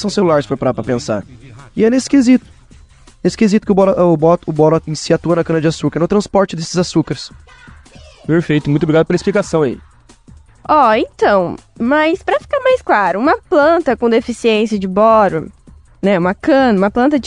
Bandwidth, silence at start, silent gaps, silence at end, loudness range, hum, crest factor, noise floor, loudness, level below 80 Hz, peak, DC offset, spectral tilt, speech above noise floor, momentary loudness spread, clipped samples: 10.5 kHz; 0 s; none; 0 s; 4 LU; none; 14 dB; -43 dBFS; -14 LUFS; -44 dBFS; 0 dBFS; 0.2%; -6 dB/octave; 30 dB; 9 LU; under 0.1%